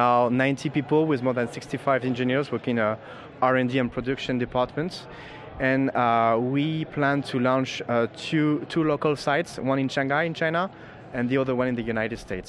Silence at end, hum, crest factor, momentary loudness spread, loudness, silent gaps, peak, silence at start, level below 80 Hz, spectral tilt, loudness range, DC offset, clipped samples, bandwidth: 0 s; none; 18 dB; 8 LU; -25 LUFS; none; -8 dBFS; 0 s; -54 dBFS; -6.5 dB/octave; 2 LU; under 0.1%; under 0.1%; 11.5 kHz